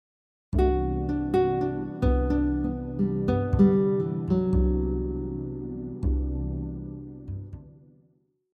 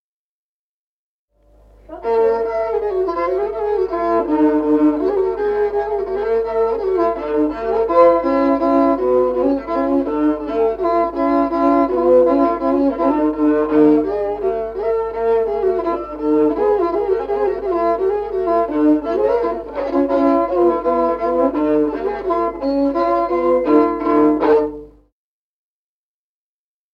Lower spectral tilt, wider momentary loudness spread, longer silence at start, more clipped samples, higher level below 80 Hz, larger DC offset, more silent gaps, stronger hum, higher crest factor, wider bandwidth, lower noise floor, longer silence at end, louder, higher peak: first, -10.5 dB/octave vs -8 dB/octave; first, 15 LU vs 6 LU; second, 0.5 s vs 1.9 s; neither; first, -32 dBFS vs -44 dBFS; neither; neither; second, none vs 50 Hz at -45 dBFS; about the same, 18 dB vs 16 dB; second, 5.2 kHz vs 5.8 kHz; second, -66 dBFS vs under -90 dBFS; second, 0.85 s vs 2.05 s; second, -26 LUFS vs -17 LUFS; second, -10 dBFS vs -2 dBFS